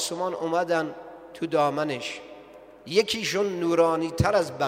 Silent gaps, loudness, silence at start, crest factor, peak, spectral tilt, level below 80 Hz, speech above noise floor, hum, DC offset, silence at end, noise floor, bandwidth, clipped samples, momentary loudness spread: none; -25 LUFS; 0 s; 18 dB; -8 dBFS; -4.5 dB/octave; -52 dBFS; 22 dB; none; under 0.1%; 0 s; -47 dBFS; 16 kHz; under 0.1%; 17 LU